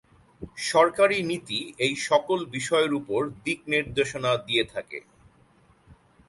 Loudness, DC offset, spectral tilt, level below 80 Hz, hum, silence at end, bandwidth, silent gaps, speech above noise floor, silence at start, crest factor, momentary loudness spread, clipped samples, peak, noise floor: -25 LUFS; under 0.1%; -3.5 dB/octave; -58 dBFS; none; 0.35 s; 11.5 kHz; none; 34 dB; 0.4 s; 20 dB; 11 LU; under 0.1%; -6 dBFS; -59 dBFS